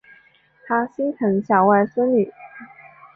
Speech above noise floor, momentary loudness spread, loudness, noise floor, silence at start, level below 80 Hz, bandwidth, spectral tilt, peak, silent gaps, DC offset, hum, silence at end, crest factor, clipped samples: 36 dB; 23 LU; -19 LUFS; -55 dBFS; 0.65 s; -66 dBFS; 3.4 kHz; -10.5 dB/octave; -4 dBFS; none; under 0.1%; none; 0.5 s; 18 dB; under 0.1%